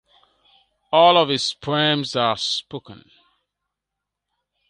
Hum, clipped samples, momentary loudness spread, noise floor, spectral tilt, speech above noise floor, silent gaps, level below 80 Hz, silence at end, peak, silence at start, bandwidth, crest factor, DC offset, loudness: none; under 0.1%; 12 LU; -83 dBFS; -4 dB/octave; 64 dB; none; -64 dBFS; 1.75 s; -2 dBFS; 0.9 s; 11 kHz; 22 dB; under 0.1%; -19 LUFS